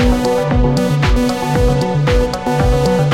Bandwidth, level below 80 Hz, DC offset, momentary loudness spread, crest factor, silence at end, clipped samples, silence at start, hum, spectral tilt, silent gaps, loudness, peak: 16 kHz; -20 dBFS; 0.3%; 2 LU; 10 dB; 0 s; under 0.1%; 0 s; none; -6.5 dB/octave; none; -15 LUFS; -2 dBFS